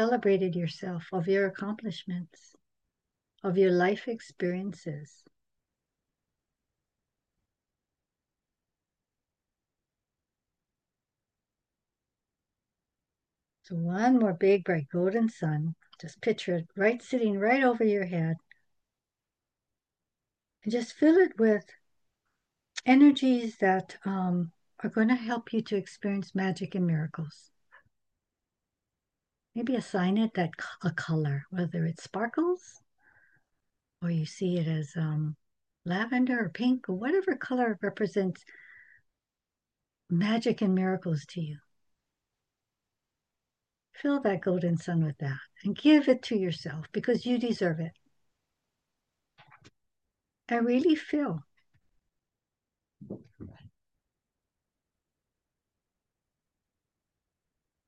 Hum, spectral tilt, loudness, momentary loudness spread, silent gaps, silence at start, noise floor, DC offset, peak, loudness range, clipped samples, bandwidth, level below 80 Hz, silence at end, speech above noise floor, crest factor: none; -7 dB/octave; -29 LUFS; 14 LU; none; 0 s; under -90 dBFS; under 0.1%; -8 dBFS; 9 LU; under 0.1%; 9 kHz; -78 dBFS; 4.2 s; over 62 dB; 22 dB